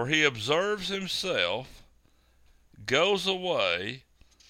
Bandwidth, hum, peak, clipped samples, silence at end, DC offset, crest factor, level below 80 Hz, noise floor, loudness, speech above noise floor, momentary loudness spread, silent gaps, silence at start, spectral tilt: 16 kHz; none; -8 dBFS; under 0.1%; 0.5 s; under 0.1%; 22 dB; -60 dBFS; -63 dBFS; -27 LUFS; 35 dB; 13 LU; none; 0 s; -3 dB/octave